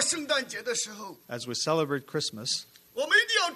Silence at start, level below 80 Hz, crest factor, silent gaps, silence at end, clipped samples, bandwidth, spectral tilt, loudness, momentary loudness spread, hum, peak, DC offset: 0 s; -76 dBFS; 18 dB; none; 0 s; under 0.1%; 13.5 kHz; -1.5 dB/octave; -28 LUFS; 15 LU; none; -10 dBFS; under 0.1%